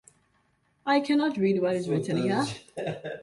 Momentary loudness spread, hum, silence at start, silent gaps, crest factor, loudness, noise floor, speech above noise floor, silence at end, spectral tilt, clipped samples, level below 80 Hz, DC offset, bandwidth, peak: 11 LU; none; 0.85 s; none; 16 dB; -27 LUFS; -69 dBFS; 43 dB; 0 s; -6 dB/octave; under 0.1%; -68 dBFS; under 0.1%; 11.5 kHz; -12 dBFS